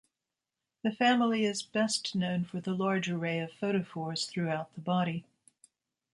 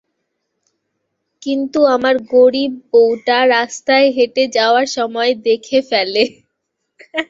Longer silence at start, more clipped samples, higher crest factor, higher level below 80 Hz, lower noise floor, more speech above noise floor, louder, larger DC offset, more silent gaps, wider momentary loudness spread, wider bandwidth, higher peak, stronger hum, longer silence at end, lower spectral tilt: second, 0.85 s vs 1.4 s; neither; about the same, 18 dB vs 14 dB; second, -76 dBFS vs -62 dBFS; first, -89 dBFS vs -73 dBFS; about the same, 58 dB vs 60 dB; second, -31 LUFS vs -14 LUFS; neither; neither; about the same, 9 LU vs 7 LU; first, 11.5 kHz vs 7.8 kHz; second, -14 dBFS vs -2 dBFS; neither; first, 0.95 s vs 0.05 s; first, -5 dB/octave vs -2.5 dB/octave